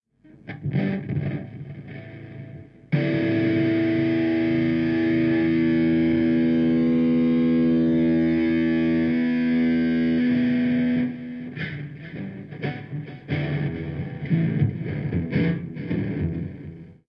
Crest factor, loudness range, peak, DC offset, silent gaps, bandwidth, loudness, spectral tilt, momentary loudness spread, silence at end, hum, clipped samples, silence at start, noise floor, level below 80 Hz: 14 dB; 8 LU; -10 dBFS; under 0.1%; none; 5.6 kHz; -23 LUFS; -10 dB/octave; 15 LU; 0.15 s; none; under 0.1%; 0.45 s; -45 dBFS; -54 dBFS